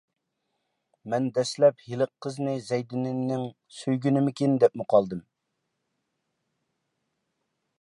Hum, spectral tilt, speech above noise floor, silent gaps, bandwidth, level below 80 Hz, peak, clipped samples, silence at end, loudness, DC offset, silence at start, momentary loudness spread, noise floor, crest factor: none; -7 dB/octave; 55 dB; none; 11.5 kHz; -72 dBFS; -6 dBFS; under 0.1%; 2.6 s; -26 LUFS; under 0.1%; 1.05 s; 10 LU; -80 dBFS; 22 dB